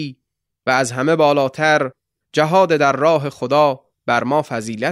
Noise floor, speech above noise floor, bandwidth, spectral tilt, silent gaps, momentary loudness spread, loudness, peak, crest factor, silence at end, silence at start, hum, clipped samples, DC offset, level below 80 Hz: -76 dBFS; 60 dB; 13 kHz; -5 dB/octave; none; 10 LU; -17 LUFS; -2 dBFS; 16 dB; 0 s; 0 s; none; under 0.1%; under 0.1%; -62 dBFS